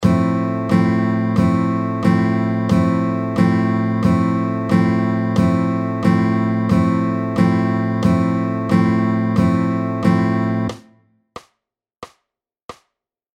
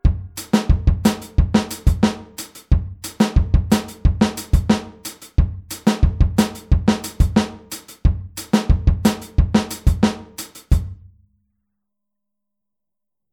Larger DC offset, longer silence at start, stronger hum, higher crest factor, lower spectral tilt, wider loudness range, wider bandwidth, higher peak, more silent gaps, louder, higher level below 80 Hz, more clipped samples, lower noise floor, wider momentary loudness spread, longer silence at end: neither; about the same, 0 s vs 0.05 s; neither; about the same, 16 dB vs 18 dB; first, -8.5 dB/octave vs -6 dB/octave; about the same, 4 LU vs 3 LU; second, 9.6 kHz vs 19 kHz; about the same, -2 dBFS vs -2 dBFS; first, 12.63-12.68 s vs none; first, -17 LUFS vs -20 LUFS; second, -44 dBFS vs -22 dBFS; neither; second, -79 dBFS vs -86 dBFS; second, 4 LU vs 14 LU; second, 0.6 s vs 2.4 s